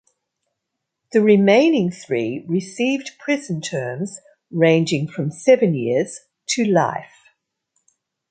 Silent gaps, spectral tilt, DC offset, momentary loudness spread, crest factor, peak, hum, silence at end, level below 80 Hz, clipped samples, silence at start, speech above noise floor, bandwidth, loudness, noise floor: none; -5.5 dB/octave; under 0.1%; 14 LU; 18 dB; -2 dBFS; none; 1.25 s; -66 dBFS; under 0.1%; 1.15 s; 61 dB; 9.4 kHz; -19 LUFS; -80 dBFS